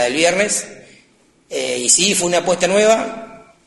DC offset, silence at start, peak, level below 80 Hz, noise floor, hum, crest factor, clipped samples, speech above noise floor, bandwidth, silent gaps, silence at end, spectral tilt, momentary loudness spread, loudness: under 0.1%; 0 s; 0 dBFS; -58 dBFS; -55 dBFS; none; 18 dB; under 0.1%; 38 dB; 12 kHz; none; 0.3 s; -2 dB/octave; 15 LU; -15 LUFS